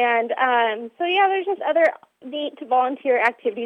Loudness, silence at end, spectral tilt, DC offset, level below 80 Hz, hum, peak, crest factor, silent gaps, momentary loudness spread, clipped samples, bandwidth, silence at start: -21 LUFS; 0 s; -4 dB/octave; under 0.1%; -80 dBFS; none; -4 dBFS; 16 dB; none; 10 LU; under 0.1%; 8.6 kHz; 0 s